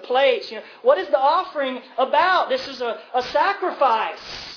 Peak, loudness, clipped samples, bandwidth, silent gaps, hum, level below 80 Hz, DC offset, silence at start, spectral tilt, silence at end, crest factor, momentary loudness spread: -4 dBFS; -21 LUFS; under 0.1%; 5.4 kHz; none; none; -62 dBFS; under 0.1%; 0 s; -3 dB/octave; 0 s; 16 dB; 9 LU